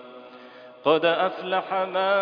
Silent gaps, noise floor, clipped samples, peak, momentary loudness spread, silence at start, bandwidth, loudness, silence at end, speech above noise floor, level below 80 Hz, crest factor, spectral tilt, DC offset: none; -45 dBFS; under 0.1%; -8 dBFS; 24 LU; 0 s; 5.2 kHz; -24 LUFS; 0 s; 23 dB; -76 dBFS; 18 dB; -7 dB/octave; under 0.1%